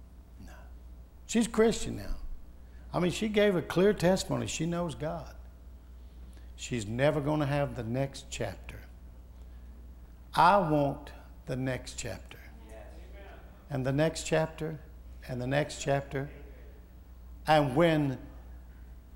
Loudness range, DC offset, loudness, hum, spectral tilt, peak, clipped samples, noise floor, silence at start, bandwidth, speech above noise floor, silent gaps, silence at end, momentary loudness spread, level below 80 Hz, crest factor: 5 LU; under 0.1%; -30 LUFS; none; -5.5 dB/octave; -8 dBFS; under 0.1%; -50 dBFS; 0 s; 16 kHz; 21 dB; none; 0 s; 25 LU; -48 dBFS; 24 dB